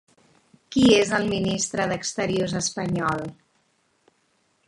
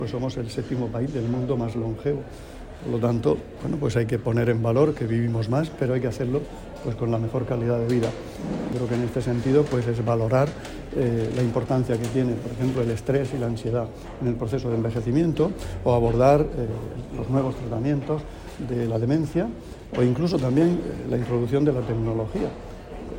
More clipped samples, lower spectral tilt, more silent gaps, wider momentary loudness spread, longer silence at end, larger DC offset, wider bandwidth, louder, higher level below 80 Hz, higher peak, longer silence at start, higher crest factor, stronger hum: neither; second, -4 dB/octave vs -8 dB/octave; neither; about the same, 10 LU vs 10 LU; first, 1.35 s vs 0 s; neither; second, 11.5 kHz vs 16 kHz; about the same, -23 LUFS vs -25 LUFS; second, -54 dBFS vs -42 dBFS; about the same, -6 dBFS vs -6 dBFS; first, 0.7 s vs 0 s; about the same, 20 dB vs 18 dB; neither